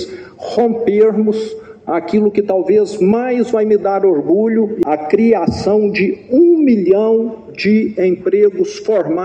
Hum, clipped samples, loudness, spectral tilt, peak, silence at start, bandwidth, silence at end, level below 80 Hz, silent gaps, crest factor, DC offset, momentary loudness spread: none; under 0.1%; -14 LUFS; -7.5 dB/octave; 0 dBFS; 0 s; 8.6 kHz; 0 s; -50 dBFS; none; 12 dB; under 0.1%; 8 LU